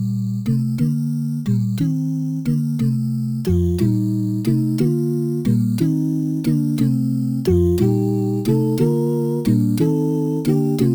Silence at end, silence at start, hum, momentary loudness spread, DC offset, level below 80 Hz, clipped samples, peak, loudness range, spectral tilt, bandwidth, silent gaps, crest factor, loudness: 0 s; 0 s; none; 4 LU; under 0.1%; -42 dBFS; under 0.1%; -4 dBFS; 2 LU; -9 dB/octave; over 20 kHz; none; 14 dB; -19 LUFS